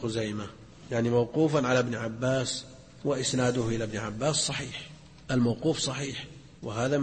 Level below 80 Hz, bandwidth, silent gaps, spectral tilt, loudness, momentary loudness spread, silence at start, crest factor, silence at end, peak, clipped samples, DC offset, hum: -54 dBFS; 8.8 kHz; none; -4.5 dB/octave; -29 LUFS; 15 LU; 0 s; 16 dB; 0 s; -14 dBFS; under 0.1%; under 0.1%; none